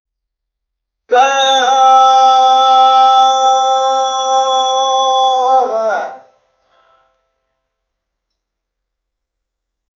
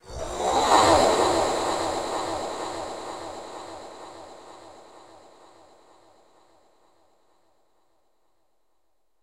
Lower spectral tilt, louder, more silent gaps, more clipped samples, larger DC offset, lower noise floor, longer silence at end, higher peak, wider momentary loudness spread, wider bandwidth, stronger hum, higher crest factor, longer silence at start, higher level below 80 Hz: second, 1 dB/octave vs -3 dB/octave; first, -10 LUFS vs -24 LUFS; neither; neither; neither; about the same, -77 dBFS vs -76 dBFS; second, 3.8 s vs 4.25 s; first, 0 dBFS vs -4 dBFS; second, 7 LU vs 25 LU; second, 7.2 kHz vs 16 kHz; neither; second, 14 dB vs 24 dB; first, 1.1 s vs 0.05 s; second, -74 dBFS vs -50 dBFS